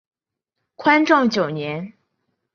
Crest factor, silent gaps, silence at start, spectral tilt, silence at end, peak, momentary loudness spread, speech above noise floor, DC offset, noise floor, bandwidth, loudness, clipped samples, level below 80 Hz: 20 dB; none; 0.8 s; -5.5 dB/octave; 0.65 s; -2 dBFS; 16 LU; 64 dB; under 0.1%; -82 dBFS; 7 kHz; -18 LUFS; under 0.1%; -66 dBFS